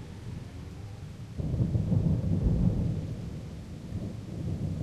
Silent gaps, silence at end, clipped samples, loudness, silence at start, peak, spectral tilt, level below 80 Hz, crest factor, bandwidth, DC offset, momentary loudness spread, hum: none; 0 s; under 0.1%; -32 LUFS; 0 s; -14 dBFS; -9 dB/octave; -38 dBFS; 18 dB; 12 kHz; under 0.1%; 15 LU; none